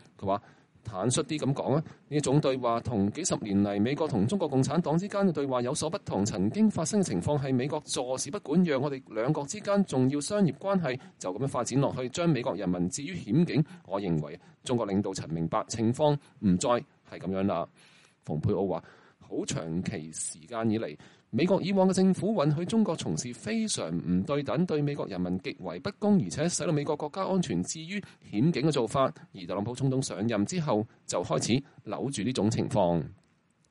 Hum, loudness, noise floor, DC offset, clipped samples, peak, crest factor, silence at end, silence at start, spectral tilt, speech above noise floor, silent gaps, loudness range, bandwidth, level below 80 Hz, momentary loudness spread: none; -29 LUFS; -68 dBFS; under 0.1%; under 0.1%; -12 dBFS; 16 dB; 0.55 s; 0.2 s; -6 dB/octave; 39 dB; none; 3 LU; 11.5 kHz; -62 dBFS; 9 LU